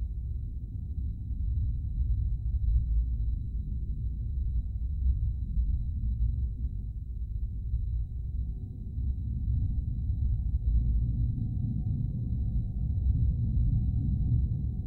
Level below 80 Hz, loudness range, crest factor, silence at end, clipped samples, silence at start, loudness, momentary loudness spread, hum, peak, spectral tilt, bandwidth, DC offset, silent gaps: -30 dBFS; 4 LU; 14 dB; 0 s; under 0.1%; 0 s; -33 LUFS; 8 LU; none; -16 dBFS; -13 dB/octave; 0.8 kHz; under 0.1%; none